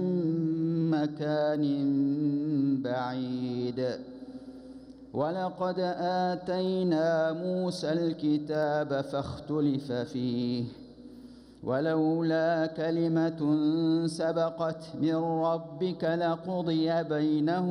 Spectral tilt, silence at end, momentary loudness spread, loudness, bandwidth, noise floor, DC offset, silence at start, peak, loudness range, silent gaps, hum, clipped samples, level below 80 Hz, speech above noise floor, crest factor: -7.5 dB/octave; 0 s; 8 LU; -29 LUFS; 11 kHz; -50 dBFS; under 0.1%; 0 s; -16 dBFS; 4 LU; none; none; under 0.1%; -66 dBFS; 21 dB; 14 dB